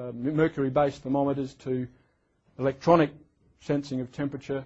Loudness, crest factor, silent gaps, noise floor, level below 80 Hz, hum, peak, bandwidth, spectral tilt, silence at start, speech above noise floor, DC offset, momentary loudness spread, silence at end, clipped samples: -27 LUFS; 22 dB; none; -68 dBFS; -58 dBFS; none; -6 dBFS; 8.2 kHz; -8 dB/octave; 0 s; 41 dB; under 0.1%; 11 LU; 0 s; under 0.1%